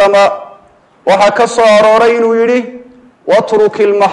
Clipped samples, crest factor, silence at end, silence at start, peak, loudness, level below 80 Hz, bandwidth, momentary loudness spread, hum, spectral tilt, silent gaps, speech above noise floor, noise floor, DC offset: under 0.1%; 10 dB; 0 s; 0 s; 0 dBFS; -9 LUFS; -52 dBFS; 11.5 kHz; 12 LU; none; -4 dB/octave; none; 36 dB; -44 dBFS; under 0.1%